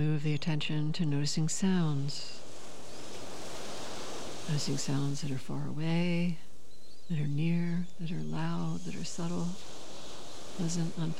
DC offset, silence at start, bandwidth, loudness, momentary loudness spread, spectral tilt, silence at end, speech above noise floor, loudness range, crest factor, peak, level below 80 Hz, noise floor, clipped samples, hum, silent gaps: 2%; 0 s; 13.5 kHz; -34 LUFS; 15 LU; -5.5 dB/octave; 0 s; 26 dB; 4 LU; 14 dB; -18 dBFS; -66 dBFS; -58 dBFS; under 0.1%; none; none